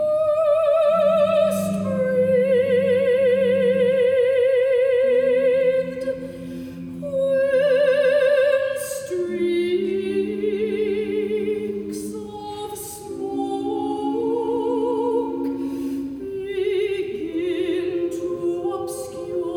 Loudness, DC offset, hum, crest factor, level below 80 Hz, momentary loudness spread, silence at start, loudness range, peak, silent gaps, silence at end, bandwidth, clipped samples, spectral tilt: -21 LUFS; under 0.1%; none; 12 dB; -58 dBFS; 12 LU; 0 s; 7 LU; -8 dBFS; none; 0 s; 16.5 kHz; under 0.1%; -5.5 dB/octave